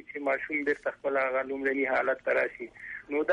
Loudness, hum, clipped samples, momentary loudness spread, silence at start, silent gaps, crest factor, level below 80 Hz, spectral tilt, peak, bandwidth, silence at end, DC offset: -29 LUFS; none; under 0.1%; 7 LU; 0.1 s; none; 14 dB; -68 dBFS; -5.5 dB/octave; -16 dBFS; 9.8 kHz; 0 s; under 0.1%